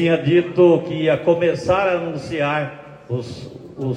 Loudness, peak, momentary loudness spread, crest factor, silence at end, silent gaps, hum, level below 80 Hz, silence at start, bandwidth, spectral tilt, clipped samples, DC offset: -19 LUFS; -2 dBFS; 17 LU; 16 dB; 0 s; none; none; -52 dBFS; 0 s; 9.2 kHz; -7.5 dB/octave; under 0.1%; under 0.1%